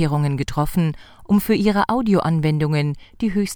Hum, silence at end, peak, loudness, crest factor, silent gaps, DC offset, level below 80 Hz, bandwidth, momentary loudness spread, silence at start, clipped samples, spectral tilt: none; 0 s; -4 dBFS; -20 LUFS; 16 dB; none; under 0.1%; -40 dBFS; over 20 kHz; 7 LU; 0 s; under 0.1%; -7 dB/octave